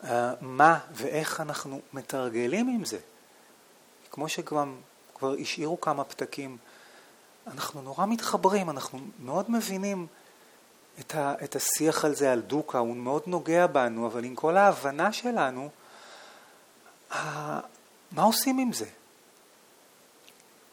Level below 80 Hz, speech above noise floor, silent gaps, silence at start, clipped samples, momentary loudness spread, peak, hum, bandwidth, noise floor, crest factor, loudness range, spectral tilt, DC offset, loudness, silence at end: -80 dBFS; 30 dB; none; 0 s; under 0.1%; 18 LU; -6 dBFS; none; 19.5 kHz; -58 dBFS; 24 dB; 7 LU; -4 dB/octave; under 0.1%; -28 LUFS; 1.8 s